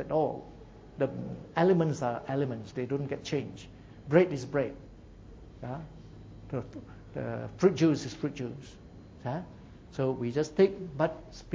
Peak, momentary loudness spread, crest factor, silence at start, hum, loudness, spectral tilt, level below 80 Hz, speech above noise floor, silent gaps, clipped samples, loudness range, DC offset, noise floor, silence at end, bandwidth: -10 dBFS; 24 LU; 22 dB; 0 s; none; -31 LUFS; -7 dB/octave; -56 dBFS; 20 dB; none; under 0.1%; 3 LU; under 0.1%; -50 dBFS; 0 s; 7.8 kHz